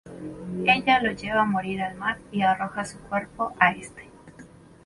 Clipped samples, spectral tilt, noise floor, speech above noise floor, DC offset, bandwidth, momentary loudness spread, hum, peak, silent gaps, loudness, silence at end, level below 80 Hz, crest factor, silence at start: under 0.1%; -5 dB/octave; -48 dBFS; 24 dB; under 0.1%; 11.5 kHz; 14 LU; none; -4 dBFS; none; -24 LUFS; 0.4 s; -56 dBFS; 22 dB; 0.05 s